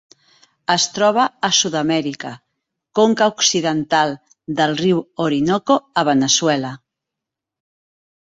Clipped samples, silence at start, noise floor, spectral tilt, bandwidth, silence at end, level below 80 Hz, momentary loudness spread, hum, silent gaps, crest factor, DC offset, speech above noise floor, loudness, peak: under 0.1%; 0.7 s; -84 dBFS; -3 dB/octave; 8 kHz; 1.5 s; -62 dBFS; 12 LU; none; none; 18 dB; under 0.1%; 67 dB; -17 LUFS; -2 dBFS